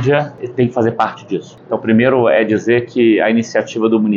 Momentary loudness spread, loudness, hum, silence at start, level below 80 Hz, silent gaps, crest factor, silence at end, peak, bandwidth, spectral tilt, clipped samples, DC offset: 11 LU; -15 LUFS; none; 0 s; -56 dBFS; none; 12 dB; 0 s; -2 dBFS; 7.4 kHz; -7 dB/octave; under 0.1%; under 0.1%